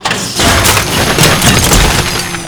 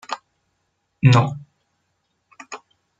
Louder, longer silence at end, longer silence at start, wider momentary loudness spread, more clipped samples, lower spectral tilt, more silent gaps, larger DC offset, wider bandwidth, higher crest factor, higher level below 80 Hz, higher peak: first, -8 LUFS vs -17 LUFS; second, 0 s vs 0.4 s; about the same, 0 s vs 0.1 s; second, 5 LU vs 23 LU; first, 0.7% vs under 0.1%; second, -3 dB/octave vs -6.5 dB/octave; neither; neither; first, over 20 kHz vs 7.8 kHz; second, 10 dB vs 20 dB; first, -20 dBFS vs -58 dBFS; about the same, 0 dBFS vs -2 dBFS